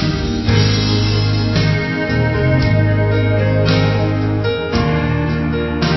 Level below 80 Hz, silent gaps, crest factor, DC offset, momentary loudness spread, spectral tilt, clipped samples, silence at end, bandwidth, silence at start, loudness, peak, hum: -28 dBFS; none; 14 dB; 0.2%; 4 LU; -7 dB/octave; under 0.1%; 0 s; 6 kHz; 0 s; -16 LUFS; 0 dBFS; none